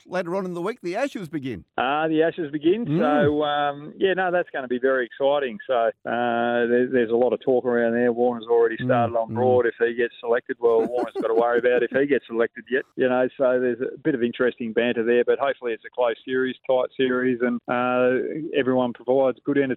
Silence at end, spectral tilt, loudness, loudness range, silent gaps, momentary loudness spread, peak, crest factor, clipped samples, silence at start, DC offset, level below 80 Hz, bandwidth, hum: 0 s; -7.5 dB/octave; -23 LUFS; 2 LU; none; 6 LU; -8 dBFS; 14 dB; under 0.1%; 0.1 s; under 0.1%; -66 dBFS; 8.6 kHz; none